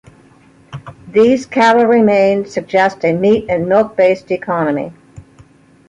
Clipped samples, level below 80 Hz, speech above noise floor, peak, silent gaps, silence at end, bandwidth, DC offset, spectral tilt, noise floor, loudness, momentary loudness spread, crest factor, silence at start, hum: under 0.1%; -50 dBFS; 34 dB; 0 dBFS; none; 0.7 s; 10.5 kHz; under 0.1%; -6.5 dB/octave; -46 dBFS; -13 LUFS; 16 LU; 14 dB; 0.7 s; none